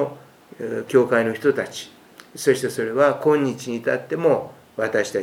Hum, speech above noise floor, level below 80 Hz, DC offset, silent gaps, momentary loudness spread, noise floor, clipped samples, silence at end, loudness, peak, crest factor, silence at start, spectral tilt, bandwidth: none; 23 dB; -68 dBFS; under 0.1%; none; 14 LU; -43 dBFS; under 0.1%; 0 s; -21 LUFS; -4 dBFS; 18 dB; 0 s; -5 dB/octave; 16.5 kHz